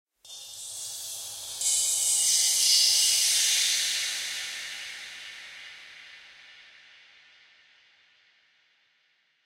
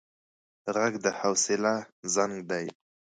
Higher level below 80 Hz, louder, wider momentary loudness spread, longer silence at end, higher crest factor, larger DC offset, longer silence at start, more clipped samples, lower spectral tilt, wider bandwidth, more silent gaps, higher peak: about the same, -76 dBFS vs -74 dBFS; first, -23 LUFS vs -28 LUFS; first, 23 LU vs 8 LU; first, 2.85 s vs 0.45 s; about the same, 20 dB vs 20 dB; neither; second, 0.25 s vs 0.65 s; neither; second, 4.5 dB/octave vs -3 dB/octave; first, 16 kHz vs 10 kHz; second, none vs 1.92-2.03 s; about the same, -8 dBFS vs -10 dBFS